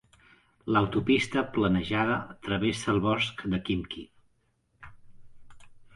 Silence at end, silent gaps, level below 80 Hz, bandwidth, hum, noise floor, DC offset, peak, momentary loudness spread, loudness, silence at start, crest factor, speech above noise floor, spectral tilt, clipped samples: 0.15 s; none; -52 dBFS; 11.5 kHz; none; -71 dBFS; under 0.1%; -12 dBFS; 8 LU; -28 LUFS; 0.65 s; 18 dB; 43 dB; -6 dB/octave; under 0.1%